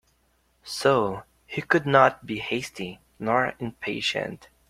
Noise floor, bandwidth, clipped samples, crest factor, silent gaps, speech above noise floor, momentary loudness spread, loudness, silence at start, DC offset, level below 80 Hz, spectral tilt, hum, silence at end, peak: -67 dBFS; 16 kHz; under 0.1%; 24 dB; none; 42 dB; 16 LU; -25 LUFS; 0.65 s; under 0.1%; -60 dBFS; -5 dB/octave; none; 0.25 s; -2 dBFS